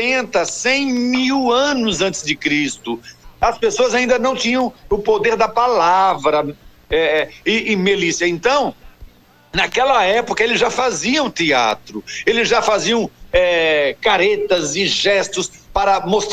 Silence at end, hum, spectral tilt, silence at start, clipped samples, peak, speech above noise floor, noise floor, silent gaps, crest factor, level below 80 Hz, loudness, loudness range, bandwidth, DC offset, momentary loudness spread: 0 s; none; -3 dB/octave; 0 s; under 0.1%; -4 dBFS; 26 dB; -43 dBFS; none; 14 dB; -42 dBFS; -16 LUFS; 2 LU; 15.5 kHz; under 0.1%; 6 LU